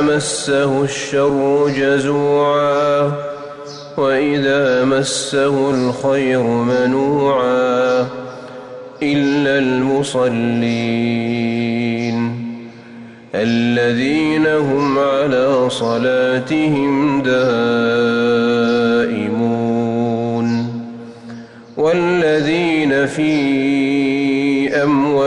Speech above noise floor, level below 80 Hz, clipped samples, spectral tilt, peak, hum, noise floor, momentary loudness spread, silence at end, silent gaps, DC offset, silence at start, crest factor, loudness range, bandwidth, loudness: 21 dB; -54 dBFS; under 0.1%; -5.5 dB/octave; -6 dBFS; none; -36 dBFS; 11 LU; 0 s; none; under 0.1%; 0 s; 10 dB; 3 LU; 11.5 kHz; -16 LUFS